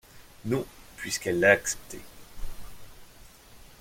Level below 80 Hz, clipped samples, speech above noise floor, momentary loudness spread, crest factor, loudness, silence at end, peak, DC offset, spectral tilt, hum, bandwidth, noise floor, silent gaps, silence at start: -46 dBFS; under 0.1%; 24 dB; 26 LU; 26 dB; -26 LUFS; 0.15 s; -6 dBFS; under 0.1%; -3.5 dB/octave; none; 16.5 kHz; -51 dBFS; none; 0.15 s